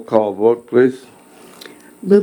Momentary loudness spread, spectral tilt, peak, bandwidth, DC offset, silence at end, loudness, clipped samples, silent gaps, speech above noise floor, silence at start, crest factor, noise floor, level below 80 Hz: 23 LU; -7.5 dB/octave; 0 dBFS; 19 kHz; under 0.1%; 0 s; -16 LUFS; under 0.1%; none; 25 dB; 0 s; 16 dB; -40 dBFS; -66 dBFS